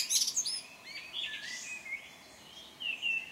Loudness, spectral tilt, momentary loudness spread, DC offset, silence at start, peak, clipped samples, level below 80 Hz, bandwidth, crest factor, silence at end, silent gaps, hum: -35 LUFS; 2.5 dB/octave; 21 LU; under 0.1%; 0 s; -14 dBFS; under 0.1%; -78 dBFS; 16 kHz; 24 dB; 0 s; none; none